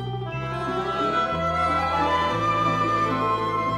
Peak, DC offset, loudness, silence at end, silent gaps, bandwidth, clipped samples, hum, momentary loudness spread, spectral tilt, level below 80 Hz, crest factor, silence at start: -12 dBFS; under 0.1%; -23 LUFS; 0 s; none; 13.5 kHz; under 0.1%; none; 6 LU; -6 dB/octave; -46 dBFS; 12 dB; 0 s